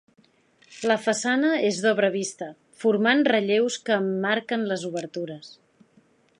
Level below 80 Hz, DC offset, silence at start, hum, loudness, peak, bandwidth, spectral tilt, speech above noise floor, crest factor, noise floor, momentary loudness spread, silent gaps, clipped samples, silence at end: -78 dBFS; under 0.1%; 0.7 s; none; -24 LUFS; -6 dBFS; 11 kHz; -4 dB/octave; 37 dB; 18 dB; -61 dBFS; 13 LU; none; under 0.1%; 0.9 s